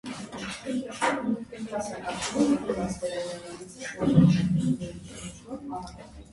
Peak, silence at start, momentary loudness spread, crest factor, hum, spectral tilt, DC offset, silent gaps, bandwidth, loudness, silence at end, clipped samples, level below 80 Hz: -6 dBFS; 0.05 s; 18 LU; 22 dB; none; -6 dB/octave; under 0.1%; none; 11.5 kHz; -28 LUFS; 0 s; under 0.1%; -52 dBFS